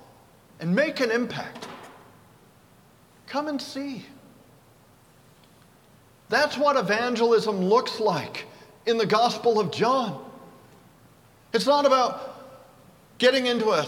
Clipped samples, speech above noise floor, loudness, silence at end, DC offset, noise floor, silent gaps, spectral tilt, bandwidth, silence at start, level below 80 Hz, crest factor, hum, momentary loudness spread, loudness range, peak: under 0.1%; 32 dB; -24 LUFS; 0 s; under 0.1%; -56 dBFS; none; -4.5 dB/octave; 16.5 kHz; 0.6 s; -68 dBFS; 20 dB; none; 18 LU; 13 LU; -6 dBFS